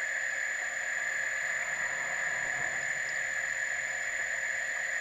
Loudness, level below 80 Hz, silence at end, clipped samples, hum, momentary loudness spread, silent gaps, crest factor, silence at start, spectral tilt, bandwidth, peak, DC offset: -31 LUFS; -68 dBFS; 0 s; under 0.1%; none; 1 LU; none; 14 dB; 0 s; 0.5 dB/octave; 15 kHz; -18 dBFS; under 0.1%